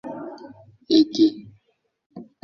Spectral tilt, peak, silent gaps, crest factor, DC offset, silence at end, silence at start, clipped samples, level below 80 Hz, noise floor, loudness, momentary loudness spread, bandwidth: -5.5 dB/octave; -6 dBFS; 2.06-2.10 s; 18 dB; under 0.1%; 0.2 s; 0.05 s; under 0.1%; -64 dBFS; -69 dBFS; -19 LUFS; 24 LU; 6.8 kHz